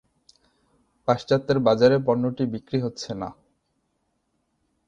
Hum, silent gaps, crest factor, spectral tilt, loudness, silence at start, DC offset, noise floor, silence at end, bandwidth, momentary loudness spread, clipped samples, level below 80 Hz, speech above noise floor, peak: none; none; 22 dB; -7 dB/octave; -23 LUFS; 1.05 s; under 0.1%; -73 dBFS; 1.55 s; 7.8 kHz; 14 LU; under 0.1%; -60 dBFS; 51 dB; -4 dBFS